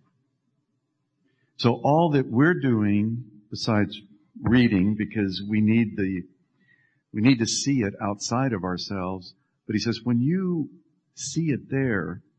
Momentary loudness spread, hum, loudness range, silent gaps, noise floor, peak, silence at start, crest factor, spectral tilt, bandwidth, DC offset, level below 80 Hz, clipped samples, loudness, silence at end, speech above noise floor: 11 LU; none; 4 LU; none; -75 dBFS; -6 dBFS; 1.6 s; 18 dB; -5.5 dB/octave; 9.4 kHz; under 0.1%; -56 dBFS; under 0.1%; -24 LUFS; 0.2 s; 52 dB